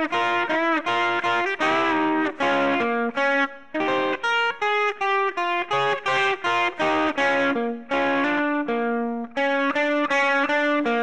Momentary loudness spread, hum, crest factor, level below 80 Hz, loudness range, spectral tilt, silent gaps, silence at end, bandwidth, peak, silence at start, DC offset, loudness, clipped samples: 4 LU; none; 10 dB; -62 dBFS; 1 LU; -4 dB/octave; none; 0 s; 10 kHz; -12 dBFS; 0 s; 0.4%; -22 LUFS; under 0.1%